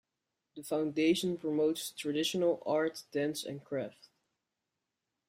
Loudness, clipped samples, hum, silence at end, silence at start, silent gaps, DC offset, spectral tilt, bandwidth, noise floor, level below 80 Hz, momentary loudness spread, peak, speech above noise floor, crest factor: -33 LUFS; under 0.1%; none; 1.4 s; 0.55 s; none; under 0.1%; -4.5 dB/octave; 16 kHz; -87 dBFS; -78 dBFS; 10 LU; -18 dBFS; 54 dB; 18 dB